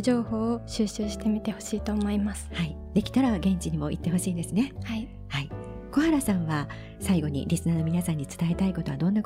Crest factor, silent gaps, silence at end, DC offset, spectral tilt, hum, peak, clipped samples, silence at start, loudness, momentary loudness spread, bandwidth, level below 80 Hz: 16 dB; none; 0 s; under 0.1%; -6 dB/octave; none; -12 dBFS; under 0.1%; 0 s; -28 LUFS; 9 LU; 16 kHz; -42 dBFS